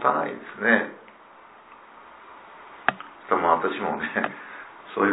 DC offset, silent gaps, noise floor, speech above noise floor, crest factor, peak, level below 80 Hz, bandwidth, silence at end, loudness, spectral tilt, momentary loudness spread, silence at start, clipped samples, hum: under 0.1%; none; -49 dBFS; 24 dB; 26 dB; 0 dBFS; -68 dBFS; 4 kHz; 0 s; -25 LUFS; -8.5 dB/octave; 24 LU; 0 s; under 0.1%; none